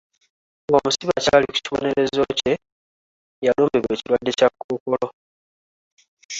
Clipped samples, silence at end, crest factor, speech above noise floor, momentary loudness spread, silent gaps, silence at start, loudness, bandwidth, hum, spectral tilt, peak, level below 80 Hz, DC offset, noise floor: under 0.1%; 0 s; 20 dB; over 70 dB; 8 LU; 2.72-3.42 s, 4.64-4.69 s, 4.80-4.86 s, 5.13-5.97 s, 6.08-6.17 s, 6.25-6.29 s; 0.7 s; -21 LUFS; 8 kHz; none; -4 dB/octave; -2 dBFS; -54 dBFS; under 0.1%; under -90 dBFS